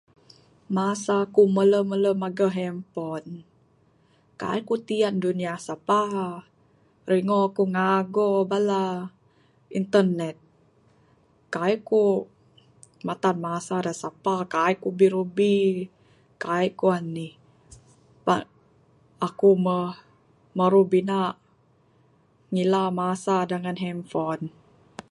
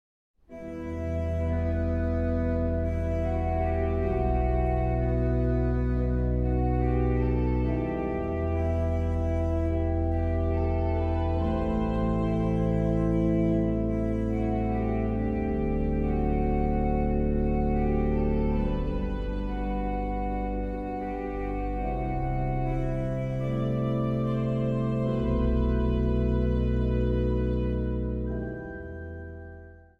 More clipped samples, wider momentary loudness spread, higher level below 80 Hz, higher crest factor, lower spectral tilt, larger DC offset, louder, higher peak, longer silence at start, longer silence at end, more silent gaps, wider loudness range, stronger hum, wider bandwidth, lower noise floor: neither; first, 14 LU vs 6 LU; second, -70 dBFS vs -32 dBFS; first, 20 dB vs 12 dB; second, -6.5 dB/octave vs -10 dB/octave; neither; first, -24 LUFS vs -28 LUFS; first, -6 dBFS vs -14 dBFS; first, 0.7 s vs 0.5 s; about the same, 0.1 s vs 0.2 s; neither; about the same, 4 LU vs 4 LU; neither; first, 11.5 kHz vs 5 kHz; first, -62 dBFS vs -47 dBFS